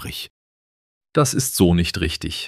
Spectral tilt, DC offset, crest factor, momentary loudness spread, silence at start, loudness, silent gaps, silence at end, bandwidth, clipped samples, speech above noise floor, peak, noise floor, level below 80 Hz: -4.5 dB/octave; under 0.1%; 18 dB; 15 LU; 0 s; -19 LUFS; 0.30-1.01 s; 0 s; 15.5 kHz; under 0.1%; over 70 dB; -2 dBFS; under -90 dBFS; -38 dBFS